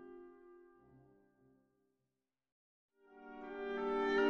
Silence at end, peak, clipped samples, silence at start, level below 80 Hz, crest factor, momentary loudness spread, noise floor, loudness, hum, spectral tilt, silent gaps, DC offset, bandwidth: 0 s; -22 dBFS; under 0.1%; 0 s; -70 dBFS; 20 dB; 25 LU; under -90 dBFS; -40 LUFS; none; -5 dB/octave; 2.52-2.89 s; under 0.1%; 7 kHz